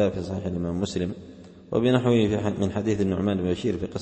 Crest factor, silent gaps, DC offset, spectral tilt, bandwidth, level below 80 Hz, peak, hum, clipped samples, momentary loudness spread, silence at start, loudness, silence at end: 18 dB; none; under 0.1%; -7 dB/octave; 8.6 kHz; -50 dBFS; -8 dBFS; none; under 0.1%; 9 LU; 0 s; -25 LUFS; 0 s